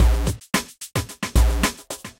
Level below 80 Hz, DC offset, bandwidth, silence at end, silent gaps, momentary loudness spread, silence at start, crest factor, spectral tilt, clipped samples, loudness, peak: -22 dBFS; under 0.1%; 16.5 kHz; 0.1 s; none; 8 LU; 0 s; 16 dB; -4.5 dB/octave; under 0.1%; -23 LUFS; -6 dBFS